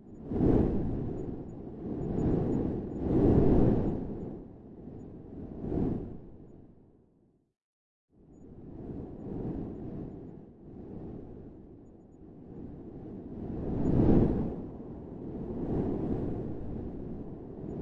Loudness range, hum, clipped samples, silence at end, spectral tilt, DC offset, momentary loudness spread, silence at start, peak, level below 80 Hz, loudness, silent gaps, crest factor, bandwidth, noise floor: 16 LU; none; under 0.1%; 0 s; -11.5 dB/octave; under 0.1%; 23 LU; 0 s; -10 dBFS; -42 dBFS; -32 LUFS; 7.64-8.08 s; 22 dB; 7.4 kHz; -68 dBFS